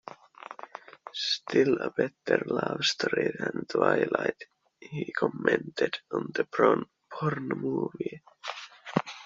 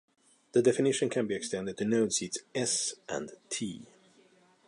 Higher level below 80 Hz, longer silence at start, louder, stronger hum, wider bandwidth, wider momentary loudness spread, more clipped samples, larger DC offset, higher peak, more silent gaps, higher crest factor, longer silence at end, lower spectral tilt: about the same, -72 dBFS vs -72 dBFS; second, 0.05 s vs 0.55 s; about the same, -29 LUFS vs -31 LUFS; neither; second, 7.6 kHz vs 11.5 kHz; first, 18 LU vs 12 LU; neither; neither; first, -6 dBFS vs -12 dBFS; neither; about the same, 24 dB vs 20 dB; second, 0 s vs 0.8 s; about the same, -3.5 dB/octave vs -3.5 dB/octave